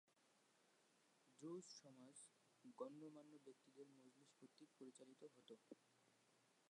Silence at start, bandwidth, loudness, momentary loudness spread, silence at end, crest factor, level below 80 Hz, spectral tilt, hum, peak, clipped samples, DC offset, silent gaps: 0.05 s; 11 kHz; -63 LUFS; 12 LU; 0 s; 24 dB; under -90 dBFS; -4.5 dB/octave; none; -40 dBFS; under 0.1%; under 0.1%; none